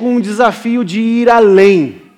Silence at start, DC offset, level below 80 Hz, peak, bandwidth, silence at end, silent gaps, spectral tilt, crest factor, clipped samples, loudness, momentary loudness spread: 0 s; under 0.1%; -54 dBFS; 0 dBFS; 11 kHz; 0.2 s; none; -6.5 dB/octave; 10 dB; under 0.1%; -10 LUFS; 8 LU